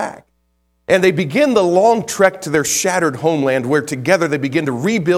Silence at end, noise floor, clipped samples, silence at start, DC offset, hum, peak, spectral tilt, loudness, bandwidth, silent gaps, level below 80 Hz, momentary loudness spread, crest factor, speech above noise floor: 0 s; -63 dBFS; under 0.1%; 0 s; under 0.1%; none; 0 dBFS; -4.5 dB/octave; -15 LUFS; 16 kHz; none; -56 dBFS; 5 LU; 16 dB; 48 dB